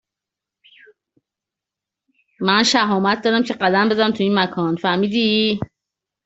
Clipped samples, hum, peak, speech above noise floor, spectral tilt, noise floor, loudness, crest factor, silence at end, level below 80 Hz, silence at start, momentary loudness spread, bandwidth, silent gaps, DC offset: under 0.1%; none; -2 dBFS; 69 dB; -4.5 dB/octave; -86 dBFS; -18 LUFS; 18 dB; 0.6 s; -60 dBFS; 2.4 s; 6 LU; 8 kHz; none; under 0.1%